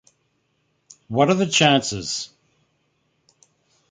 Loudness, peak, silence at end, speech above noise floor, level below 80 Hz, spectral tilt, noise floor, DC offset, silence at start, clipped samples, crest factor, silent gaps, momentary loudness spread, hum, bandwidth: -19 LUFS; -2 dBFS; 1.65 s; 50 dB; -58 dBFS; -4 dB/octave; -69 dBFS; under 0.1%; 1.1 s; under 0.1%; 22 dB; none; 12 LU; none; 9.6 kHz